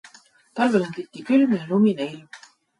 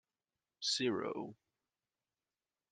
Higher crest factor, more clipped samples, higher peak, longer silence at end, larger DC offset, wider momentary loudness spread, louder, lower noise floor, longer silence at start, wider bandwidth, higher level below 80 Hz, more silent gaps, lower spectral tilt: second, 16 dB vs 22 dB; neither; first, -6 dBFS vs -22 dBFS; second, 0.4 s vs 1.4 s; neither; first, 16 LU vs 12 LU; first, -22 LUFS vs -38 LUFS; second, -53 dBFS vs under -90 dBFS; about the same, 0.55 s vs 0.6 s; about the same, 11 kHz vs 10 kHz; first, -70 dBFS vs -86 dBFS; neither; first, -7 dB/octave vs -3 dB/octave